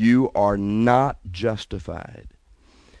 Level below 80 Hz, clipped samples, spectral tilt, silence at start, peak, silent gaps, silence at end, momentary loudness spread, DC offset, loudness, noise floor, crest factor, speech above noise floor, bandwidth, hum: -44 dBFS; under 0.1%; -7.5 dB/octave; 0 s; -4 dBFS; none; 0.7 s; 17 LU; under 0.1%; -21 LUFS; -54 dBFS; 18 dB; 33 dB; 10 kHz; none